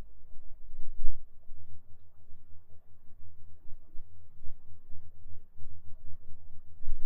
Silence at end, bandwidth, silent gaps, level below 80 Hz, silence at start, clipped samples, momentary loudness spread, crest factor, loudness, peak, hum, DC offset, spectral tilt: 0 s; 0.4 kHz; none; -38 dBFS; 0 s; under 0.1%; 17 LU; 18 dB; -53 LUFS; -6 dBFS; none; under 0.1%; -9 dB/octave